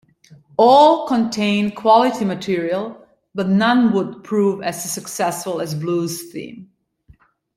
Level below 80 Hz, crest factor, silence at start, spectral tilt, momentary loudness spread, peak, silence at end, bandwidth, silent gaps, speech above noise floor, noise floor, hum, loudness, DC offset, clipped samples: -62 dBFS; 16 dB; 0.6 s; -5 dB/octave; 14 LU; -2 dBFS; 0.95 s; 16 kHz; none; 35 dB; -52 dBFS; none; -18 LUFS; under 0.1%; under 0.1%